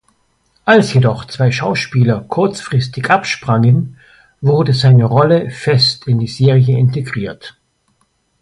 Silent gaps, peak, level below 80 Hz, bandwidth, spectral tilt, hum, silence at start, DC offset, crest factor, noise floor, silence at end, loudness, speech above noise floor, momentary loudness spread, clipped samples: none; 0 dBFS; -48 dBFS; 11 kHz; -6.5 dB/octave; none; 0.65 s; under 0.1%; 14 dB; -61 dBFS; 0.9 s; -13 LUFS; 49 dB; 10 LU; under 0.1%